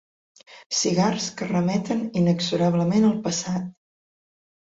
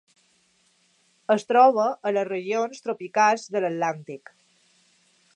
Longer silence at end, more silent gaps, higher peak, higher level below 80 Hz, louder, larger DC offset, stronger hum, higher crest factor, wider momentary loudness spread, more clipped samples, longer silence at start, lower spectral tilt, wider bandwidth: second, 1 s vs 1.2 s; first, 0.66-0.70 s vs none; about the same, -8 dBFS vs -6 dBFS; first, -62 dBFS vs -84 dBFS; about the same, -23 LUFS vs -23 LUFS; neither; neither; about the same, 16 dB vs 20 dB; second, 7 LU vs 18 LU; neither; second, 0.5 s vs 1.3 s; about the same, -5 dB/octave vs -4.5 dB/octave; second, 8 kHz vs 10 kHz